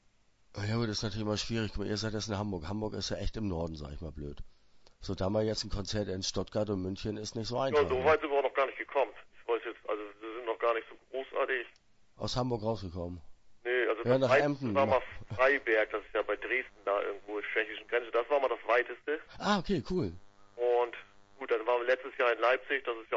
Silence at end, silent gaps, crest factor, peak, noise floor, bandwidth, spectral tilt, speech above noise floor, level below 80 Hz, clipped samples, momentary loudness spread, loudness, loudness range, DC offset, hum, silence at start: 0 s; none; 20 dB; -14 dBFS; -67 dBFS; 8 kHz; -5 dB/octave; 35 dB; -52 dBFS; under 0.1%; 14 LU; -32 LUFS; 7 LU; under 0.1%; none; 0.55 s